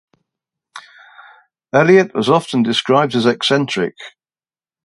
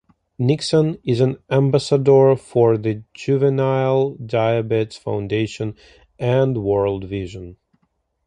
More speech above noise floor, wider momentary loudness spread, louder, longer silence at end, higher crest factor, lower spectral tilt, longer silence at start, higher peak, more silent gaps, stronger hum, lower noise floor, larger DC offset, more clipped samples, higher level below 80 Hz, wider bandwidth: first, over 76 dB vs 50 dB; about the same, 11 LU vs 11 LU; first, -15 LUFS vs -19 LUFS; about the same, 0.75 s vs 0.7 s; about the same, 18 dB vs 16 dB; second, -5.5 dB/octave vs -7.5 dB/octave; first, 0.75 s vs 0.4 s; about the same, 0 dBFS vs -2 dBFS; neither; neither; first, under -90 dBFS vs -69 dBFS; neither; neither; second, -62 dBFS vs -50 dBFS; first, 11.5 kHz vs 10 kHz